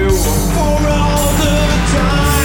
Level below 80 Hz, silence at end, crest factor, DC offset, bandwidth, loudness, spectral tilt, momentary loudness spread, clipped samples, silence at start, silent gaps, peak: -16 dBFS; 0 s; 10 dB; under 0.1%; over 20 kHz; -13 LUFS; -4.5 dB/octave; 1 LU; under 0.1%; 0 s; none; -2 dBFS